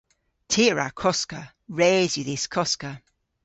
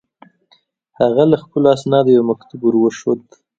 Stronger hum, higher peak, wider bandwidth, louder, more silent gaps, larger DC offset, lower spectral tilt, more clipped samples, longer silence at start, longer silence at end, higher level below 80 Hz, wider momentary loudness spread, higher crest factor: neither; second, -8 dBFS vs 0 dBFS; about the same, 8.2 kHz vs 8 kHz; second, -23 LUFS vs -15 LUFS; neither; neither; second, -3.5 dB/octave vs -7.5 dB/octave; neither; second, 0.5 s vs 1 s; about the same, 0.45 s vs 0.4 s; about the same, -58 dBFS vs -58 dBFS; first, 16 LU vs 9 LU; about the same, 18 dB vs 16 dB